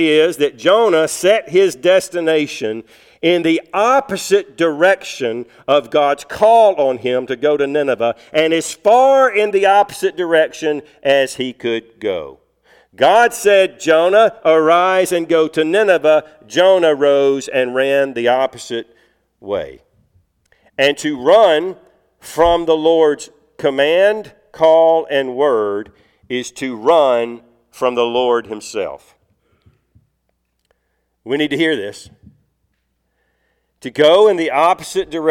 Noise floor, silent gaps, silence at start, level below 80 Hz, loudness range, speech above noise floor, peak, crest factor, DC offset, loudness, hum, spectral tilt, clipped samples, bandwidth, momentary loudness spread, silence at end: -68 dBFS; none; 0 s; -52 dBFS; 9 LU; 54 dB; -2 dBFS; 14 dB; under 0.1%; -14 LUFS; none; -4 dB/octave; under 0.1%; 16.5 kHz; 13 LU; 0 s